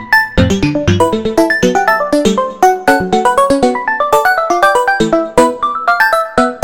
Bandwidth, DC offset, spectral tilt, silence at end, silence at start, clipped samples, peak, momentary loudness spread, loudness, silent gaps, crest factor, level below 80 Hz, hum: 17.5 kHz; 1%; -5 dB/octave; 0 s; 0 s; 0.3%; 0 dBFS; 3 LU; -11 LUFS; none; 12 dB; -32 dBFS; none